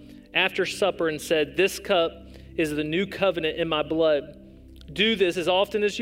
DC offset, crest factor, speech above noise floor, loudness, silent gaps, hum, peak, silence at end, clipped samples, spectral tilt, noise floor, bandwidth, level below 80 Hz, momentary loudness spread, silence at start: under 0.1%; 18 dB; 22 dB; -24 LUFS; none; none; -8 dBFS; 0 s; under 0.1%; -4 dB/octave; -46 dBFS; 16 kHz; -52 dBFS; 6 LU; 0 s